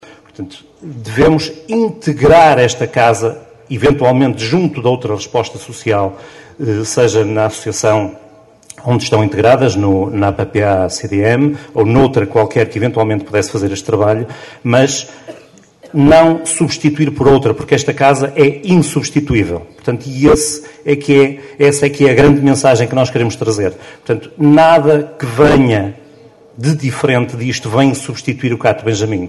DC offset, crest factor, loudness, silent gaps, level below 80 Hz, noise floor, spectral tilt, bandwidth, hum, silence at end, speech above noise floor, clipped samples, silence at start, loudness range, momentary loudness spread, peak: under 0.1%; 12 dB; -12 LUFS; none; -38 dBFS; -41 dBFS; -5.5 dB/octave; 12.5 kHz; none; 0 s; 29 dB; under 0.1%; 0.4 s; 4 LU; 12 LU; 0 dBFS